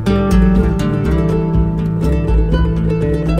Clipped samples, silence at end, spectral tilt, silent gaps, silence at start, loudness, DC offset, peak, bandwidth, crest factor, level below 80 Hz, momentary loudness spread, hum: under 0.1%; 0 s; -8.5 dB/octave; none; 0 s; -15 LUFS; under 0.1%; 0 dBFS; 11 kHz; 12 dB; -18 dBFS; 4 LU; none